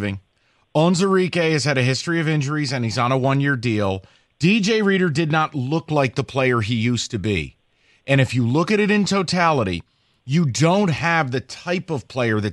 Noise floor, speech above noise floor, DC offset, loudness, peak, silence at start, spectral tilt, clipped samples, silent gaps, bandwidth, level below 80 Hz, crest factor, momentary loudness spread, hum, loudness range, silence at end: -63 dBFS; 44 dB; under 0.1%; -20 LUFS; -2 dBFS; 0 s; -5.5 dB/octave; under 0.1%; none; 11.5 kHz; -52 dBFS; 18 dB; 8 LU; none; 2 LU; 0 s